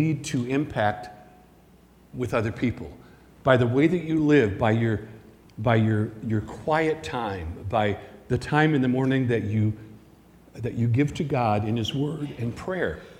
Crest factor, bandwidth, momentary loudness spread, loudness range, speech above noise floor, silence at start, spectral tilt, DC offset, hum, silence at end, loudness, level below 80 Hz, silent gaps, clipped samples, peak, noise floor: 20 dB; 11.5 kHz; 12 LU; 4 LU; 30 dB; 0 s; -7 dB/octave; under 0.1%; none; 0.05 s; -25 LUFS; -50 dBFS; none; under 0.1%; -4 dBFS; -54 dBFS